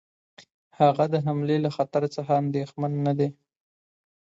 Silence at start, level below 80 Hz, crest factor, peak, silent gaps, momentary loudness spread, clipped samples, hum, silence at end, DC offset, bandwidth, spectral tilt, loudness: 0.4 s; -70 dBFS; 20 dB; -6 dBFS; 0.54-0.71 s; 7 LU; under 0.1%; none; 1 s; under 0.1%; 7.8 kHz; -8.5 dB/octave; -25 LUFS